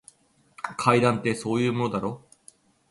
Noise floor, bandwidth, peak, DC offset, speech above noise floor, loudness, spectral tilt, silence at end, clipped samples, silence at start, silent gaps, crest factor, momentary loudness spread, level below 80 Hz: -57 dBFS; 11.5 kHz; -6 dBFS; under 0.1%; 33 dB; -25 LUFS; -6 dB/octave; 0.75 s; under 0.1%; 0.65 s; none; 22 dB; 15 LU; -62 dBFS